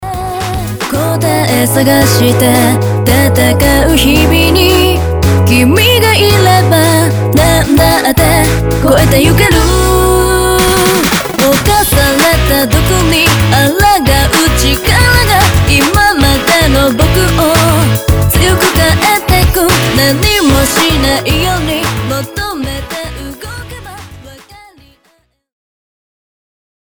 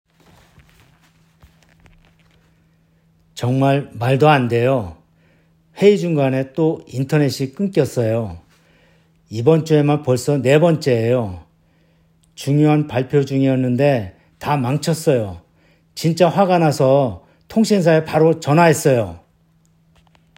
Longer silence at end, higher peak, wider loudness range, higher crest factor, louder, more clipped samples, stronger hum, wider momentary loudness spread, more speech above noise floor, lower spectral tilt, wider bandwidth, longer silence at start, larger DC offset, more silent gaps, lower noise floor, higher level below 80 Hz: first, 2.3 s vs 1.2 s; about the same, 0 dBFS vs 0 dBFS; about the same, 6 LU vs 4 LU; second, 8 dB vs 18 dB; first, -8 LUFS vs -17 LUFS; neither; neither; about the same, 9 LU vs 11 LU; first, 46 dB vs 41 dB; second, -4.5 dB/octave vs -6.5 dB/octave; first, over 20 kHz vs 16.5 kHz; second, 0 s vs 3.35 s; first, 0.4% vs under 0.1%; neither; about the same, -54 dBFS vs -57 dBFS; first, -18 dBFS vs -56 dBFS